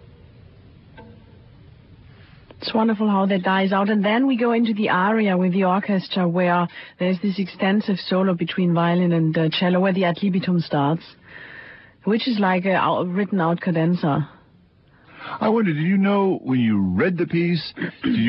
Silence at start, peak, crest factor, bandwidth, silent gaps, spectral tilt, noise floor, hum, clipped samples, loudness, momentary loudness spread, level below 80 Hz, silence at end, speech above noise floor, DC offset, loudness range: 0.95 s; -6 dBFS; 14 dB; 5.8 kHz; none; -11.5 dB/octave; -54 dBFS; none; under 0.1%; -20 LUFS; 7 LU; -56 dBFS; 0 s; 34 dB; under 0.1%; 3 LU